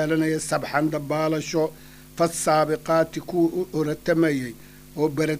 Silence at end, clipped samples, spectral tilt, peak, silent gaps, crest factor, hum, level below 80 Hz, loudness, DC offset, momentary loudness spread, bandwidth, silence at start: 0 s; under 0.1%; -5.5 dB/octave; -6 dBFS; none; 18 dB; none; -54 dBFS; -24 LUFS; under 0.1%; 8 LU; 15.5 kHz; 0 s